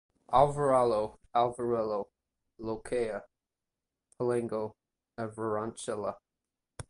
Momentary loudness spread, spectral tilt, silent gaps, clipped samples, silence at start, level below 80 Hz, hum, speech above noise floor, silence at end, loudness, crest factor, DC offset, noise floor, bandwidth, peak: 16 LU; -6 dB/octave; none; under 0.1%; 0.3 s; -62 dBFS; none; 59 dB; 0.05 s; -31 LUFS; 22 dB; under 0.1%; -89 dBFS; 11.5 kHz; -10 dBFS